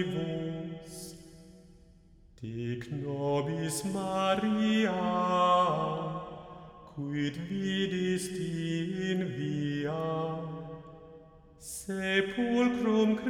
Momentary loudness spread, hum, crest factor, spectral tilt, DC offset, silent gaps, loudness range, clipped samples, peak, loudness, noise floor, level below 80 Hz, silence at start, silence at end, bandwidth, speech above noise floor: 18 LU; none; 18 dB; -5.5 dB/octave; under 0.1%; none; 7 LU; under 0.1%; -14 dBFS; -31 LUFS; -58 dBFS; -60 dBFS; 0 s; 0 s; 16.5 kHz; 28 dB